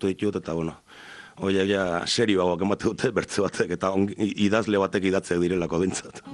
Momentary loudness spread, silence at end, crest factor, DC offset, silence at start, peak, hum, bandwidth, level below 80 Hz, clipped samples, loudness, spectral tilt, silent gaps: 9 LU; 0 s; 16 dB; under 0.1%; 0 s; -8 dBFS; none; 11 kHz; -58 dBFS; under 0.1%; -25 LUFS; -5 dB/octave; none